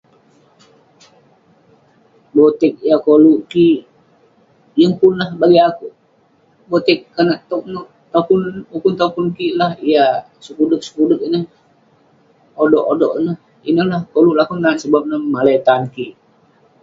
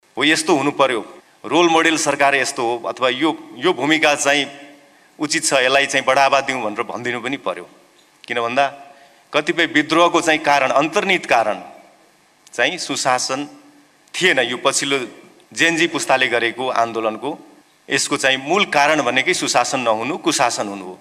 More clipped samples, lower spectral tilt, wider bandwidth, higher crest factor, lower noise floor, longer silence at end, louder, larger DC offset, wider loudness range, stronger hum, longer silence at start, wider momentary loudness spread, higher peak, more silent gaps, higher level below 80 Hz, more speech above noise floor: neither; first, -7 dB/octave vs -2.5 dB/octave; second, 7.6 kHz vs 15.5 kHz; about the same, 16 dB vs 18 dB; about the same, -55 dBFS vs -54 dBFS; first, 0.7 s vs 0.05 s; about the same, -15 LUFS vs -17 LUFS; neither; about the same, 4 LU vs 4 LU; neither; first, 2.35 s vs 0.15 s; about the same, 12 LU vs 11 LU; about the same, 0 dBFS vs -2 dBFS; neither; about the same, -60 dBFS vs -64 dBFS; first, 41 dB vs 36 dB